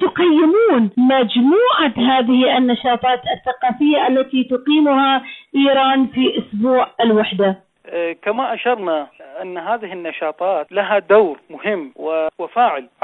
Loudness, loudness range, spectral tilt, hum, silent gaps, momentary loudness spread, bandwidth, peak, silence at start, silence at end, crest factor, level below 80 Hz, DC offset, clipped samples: -16 LUFS; 6 LU; -8.5 dB/octave; none; none; 10 LU; 4.1 kHz; -2 dBFS; 0 s; 0.2 s; 14 dB; -60 dBFS; under 0.1%; under 0.1%